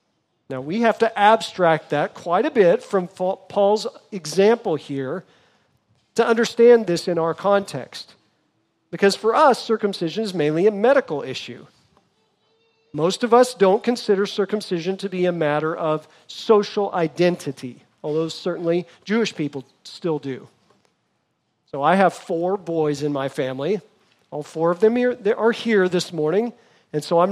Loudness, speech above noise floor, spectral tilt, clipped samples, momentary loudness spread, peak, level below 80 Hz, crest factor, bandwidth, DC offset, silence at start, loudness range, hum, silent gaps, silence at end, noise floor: -20 LUFS; 51 dB; -5.5 dB/octave; under 0.1%; 15 LU; -2 dBFS; -74 dBFS; 20 dB; 13 kHz; under 0.1%; 0.5 s; 5 LU; none; none; 0 s; -71 dBFS